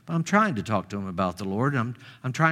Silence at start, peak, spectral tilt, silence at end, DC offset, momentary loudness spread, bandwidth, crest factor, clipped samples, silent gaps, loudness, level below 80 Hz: 0.05 s; -4 dBFS; -6.5 dB/octave; 0 s; under 0.1%; 11 LU; 14 kHz; 22 dB; under 0.1%; none; -26 LUFS; -62 dBFS